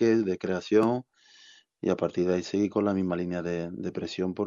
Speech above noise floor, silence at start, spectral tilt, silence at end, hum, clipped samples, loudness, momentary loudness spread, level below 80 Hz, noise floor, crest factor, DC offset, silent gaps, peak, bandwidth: 29 dB; 0 s; -7 dB/octave; 0 s; none; under 0.1%; -28 LUFS; 9 LU; -68 dBFS; -56 dBFS; 18 dB; under 0.1%; none; -10 dBFS; 7.4 kHz